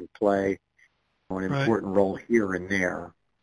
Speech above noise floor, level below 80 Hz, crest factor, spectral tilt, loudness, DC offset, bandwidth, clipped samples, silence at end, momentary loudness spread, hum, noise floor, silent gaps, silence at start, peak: 40 dB; -58 dBFS; 20 dB; -6.5 dB/octave; -26 LUFS; under 0.1%; 11 kHz; under 0.1%; 0.35 s; 12 LU; none; -65 dBFS; none; 0 s; -8 dBFS